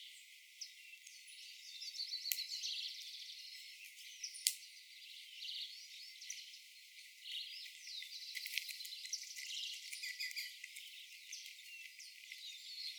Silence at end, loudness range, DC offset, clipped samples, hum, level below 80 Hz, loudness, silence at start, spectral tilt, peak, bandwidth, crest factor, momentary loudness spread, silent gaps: 0 s; 5 LU; under 0.1%; under 0.1%; none; under -90 dBFS; -46 LUFS; 0 s; 10 dB/octave; -10 dBFS; over 20 kHz; 40 dB; 14 LU; none